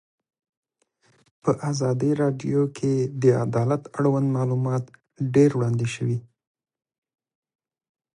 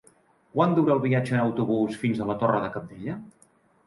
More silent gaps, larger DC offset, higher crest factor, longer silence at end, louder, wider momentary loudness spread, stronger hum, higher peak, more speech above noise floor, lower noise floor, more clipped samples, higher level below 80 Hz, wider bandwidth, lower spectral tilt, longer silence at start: neither; neither; about the same, 18 dB vs 18 dB; first, 1.95 s vs 0.55 s; about the same, -23 LUFS vs -25 LUFS; second, 8 LU vs 13 LU; neither; about the same, -6 dBFS vs -8 dBFS; first, 44 dB vs 37 dB; first, -66 dBFS vs -61 dBFS; neither; about the same, -64 dBFS vs -62 dBFS; about the same, 11 kHz vs 11.5 kHz; about the same, -7.5 dB/octave vs -8 dB/octave; first, 1.45 s vs 0.55 s